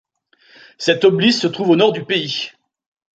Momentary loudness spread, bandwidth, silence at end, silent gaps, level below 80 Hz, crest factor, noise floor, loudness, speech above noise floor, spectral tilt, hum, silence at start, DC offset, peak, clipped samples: 10 LU; 9 kHz; 0.65 s; none; -64 dBFS; 16 dB; -55 dBFS; -16 LUFS; 39 dB; -5 dB/octave; none; 0.8 s; under 0.1%; -2 dBFS; under 0.1%